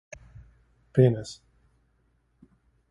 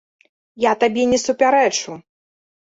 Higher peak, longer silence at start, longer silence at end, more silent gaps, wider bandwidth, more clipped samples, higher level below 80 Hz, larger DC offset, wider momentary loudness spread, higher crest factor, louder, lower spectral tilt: second, -8 dBFS vs -4 dBFS; first, 0.95 s vs 0.55 s; first, 1.55 s vs 0.75 s; neither; first, 11 kHz vs 8 kHz; neither; about the same, -58 dBFS vs -56 dBFS; neither; first, 25 LU vs 13 LU; first, 22 dB vs 16 dB; second, -24 LUFS vs -17 LUFS; first, -8 dB/octave vs -3 dB/octave